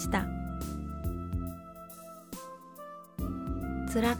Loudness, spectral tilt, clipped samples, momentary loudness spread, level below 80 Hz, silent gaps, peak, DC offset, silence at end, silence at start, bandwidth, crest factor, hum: -38 LUFS; -6 dB/octave; under 0.1%; 15 LU; -42 dBFS; none; -14 dBFS; under 0.1%; 0 s; 0 s; over 20 kHz; 22 dB; none